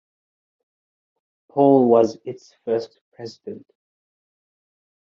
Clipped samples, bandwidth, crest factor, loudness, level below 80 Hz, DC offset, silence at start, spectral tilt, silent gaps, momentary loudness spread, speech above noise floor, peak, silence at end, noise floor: under 0.1%; 7.4 kHz; 20 dB; -18 LUFS; -72 dBFS; under 0.1%; 1.55 s; -8 dB/octave; 3.01-3.12 s; 23 LU; over 70 dB; -2 dBFS; 1.5 s; under -90 dBFS